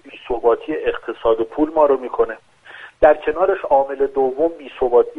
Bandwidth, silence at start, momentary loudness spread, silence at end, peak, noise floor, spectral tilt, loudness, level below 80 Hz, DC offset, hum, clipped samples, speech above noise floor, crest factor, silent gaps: 4 kHz; 0.05 s; 8 LU; 0 s; 0 dBFS; -41 dBFS; -7 dB/octave; -18 LUFS; -44 dBFS; under 0.1%; none; under 0.1%; 24 dB; 18 dB; none